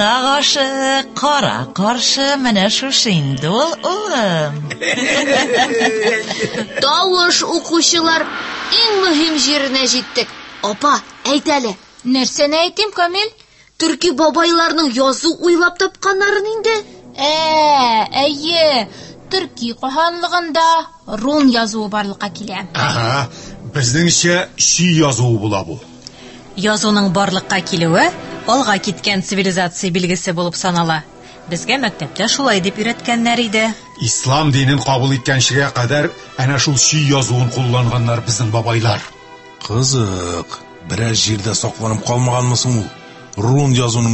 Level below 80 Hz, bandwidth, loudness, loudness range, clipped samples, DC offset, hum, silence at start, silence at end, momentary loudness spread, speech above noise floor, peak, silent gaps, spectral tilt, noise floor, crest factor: -46 dBFS; 8.6 kHz; -15 LUFS; 4 LU; under 0.1%; under 0.1%; none; 0 s; 0 s; 10 LU; 22 dB; 0 dBFS; none; -3.5 dB/octave; -37 dBFS; 16 dB